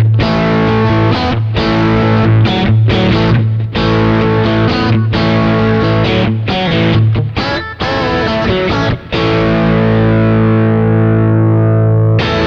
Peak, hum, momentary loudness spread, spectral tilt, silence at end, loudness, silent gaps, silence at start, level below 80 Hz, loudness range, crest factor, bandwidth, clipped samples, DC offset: 0 dBFS; none; 4 LU; -8 dB/octave; 0 s; -11 LUFS; none; 0 s; -28 dBFS; 2 LU; 10 dB; 6.4 kHz; under 0.1%; under 0.1%